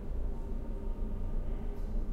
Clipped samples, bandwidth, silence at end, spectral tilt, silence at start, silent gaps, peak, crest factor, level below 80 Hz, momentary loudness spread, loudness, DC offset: under 0.1%; 3.2 kHz; 0 s; -9 dB/octave; 0 s; none; -24 dBFS; 10 dB; -34 dBFS; 2 LU; -41 LUFS; under 0.1%